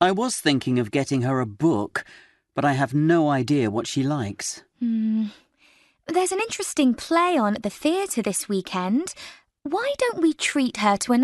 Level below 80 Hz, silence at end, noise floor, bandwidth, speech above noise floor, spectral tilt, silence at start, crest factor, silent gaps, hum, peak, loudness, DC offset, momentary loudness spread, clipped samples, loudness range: -62 dBFS; 0 s; -59 dBFS; 12.5 kHz; 36 dB; -5 dB/octave; 0 s; 18 dB; none; none; -6 dBFS; -23 LUFS; under 0.1%; 10 LU; under 0.1%; 2 LU